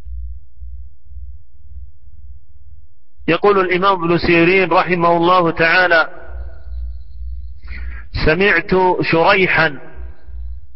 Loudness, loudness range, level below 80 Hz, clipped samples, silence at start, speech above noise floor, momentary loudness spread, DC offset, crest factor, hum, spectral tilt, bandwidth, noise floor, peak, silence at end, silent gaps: -13 LUFS; 6 LU; -32 dBFS; under 0.1%; 0.05 s; 32 dB; 22 LU; 4%; 16 dB; none; -10 dB/octave; 5.8 kHz; -46 dBFS; -2 dBFS; 0.15 s; none